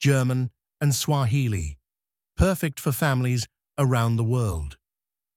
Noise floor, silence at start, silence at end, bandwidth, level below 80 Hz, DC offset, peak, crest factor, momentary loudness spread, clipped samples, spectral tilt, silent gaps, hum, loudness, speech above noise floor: under -90 dBFS; 0 s; 0.6 s; 17 kHz; -38 dBFS; under 0.1%; -6 dBFS; 20 dB; 11 LU; under 0.1%; -5.5 dB/octave; none; none; -24 LUFS; over 67 dB